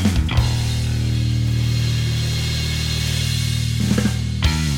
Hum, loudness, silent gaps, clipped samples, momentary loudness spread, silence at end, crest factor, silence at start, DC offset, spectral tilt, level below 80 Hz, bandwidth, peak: none; -20 LUFS; none; under 0.1%; 2 LU; 0 s; 16 dB; 0 s; under 0.1%; -5 dB/octave; -28 dBFS; 16.5 kHz; -4 dBFS